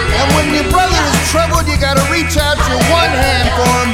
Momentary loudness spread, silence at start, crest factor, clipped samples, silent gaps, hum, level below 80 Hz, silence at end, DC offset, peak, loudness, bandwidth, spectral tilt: 2 LU; 0 s; 12 dB; under 0.1%; none; none; -20 dBFS; 0 s; under 0.1%; 0 dBFS; -12 LUFS; 17 kHz; -4 dB/octave